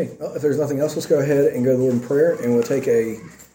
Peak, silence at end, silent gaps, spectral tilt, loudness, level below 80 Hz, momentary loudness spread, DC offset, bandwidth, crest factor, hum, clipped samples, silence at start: -6 dBFS; 0.1 s; none; -7 dB/octave; -20 LUFS; -58 dBFS; 6 LU; under 0.1%; 17 kHz; 14 dB; none; under 0.1%; 0 s